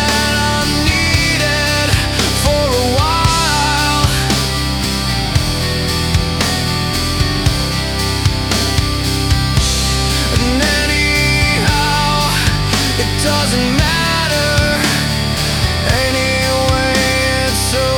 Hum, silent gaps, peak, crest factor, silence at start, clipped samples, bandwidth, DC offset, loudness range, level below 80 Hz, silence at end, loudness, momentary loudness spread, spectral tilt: none; none; 0 dBFS; 14 dB; 0 s; under 0.1%; 18 kHz; under 0.1%; 2 LU; -22 dBFS; 0 s; -14 LUFS; 4 LU; -3.5 dB/octave